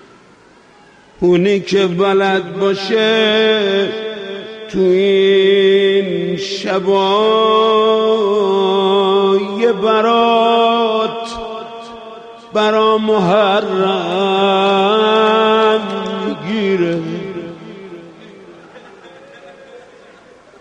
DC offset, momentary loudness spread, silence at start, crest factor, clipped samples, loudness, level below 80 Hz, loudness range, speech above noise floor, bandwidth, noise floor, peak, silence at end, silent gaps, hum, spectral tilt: under 0.1%; 15 LU; 1.2 s; 14 dB; under 0.1%; -14 LUFS; -54 dBFS; 6 LU; 33 dB; 8.8 kHz; -45 dBFS; -2 dBFS; 0.8 s; none; none; -5.5 dB/octave